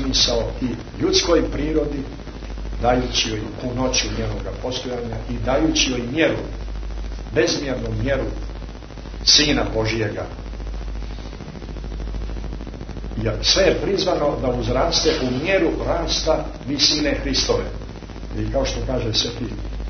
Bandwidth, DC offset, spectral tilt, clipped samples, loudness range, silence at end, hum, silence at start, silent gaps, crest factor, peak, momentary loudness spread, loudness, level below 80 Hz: 6.6 kHz; under 0.1%; -3.5 dB/octave; under 0.1%; 4 LU; 0 s; none; 0 s; none; 20 dB; -2 dBFS; 16 LU; -20 LUFS; -30 dBFS